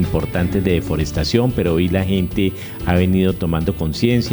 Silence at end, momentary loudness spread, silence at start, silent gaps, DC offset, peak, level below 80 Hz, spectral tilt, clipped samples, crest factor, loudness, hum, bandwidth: 0 s; 4 LU; 0 s; none; under 0.1%; -2 dBFS; -32 dBFS; -7 dB/octave; under 0.1%; 16 dB; -18 LUFS; none; over 20 kHz